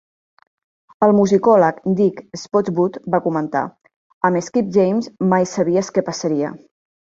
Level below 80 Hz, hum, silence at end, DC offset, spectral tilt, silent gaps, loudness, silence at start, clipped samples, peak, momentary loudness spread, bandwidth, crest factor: -60 dBFS; none; 0.45 s; under 0.1%; -6.5 dB/octave; 3.96-4.21 s; -18 LUFS; 1 s; under 0.1%; 0 dBFS; 8 LU; 7.8 kHz; 18 dB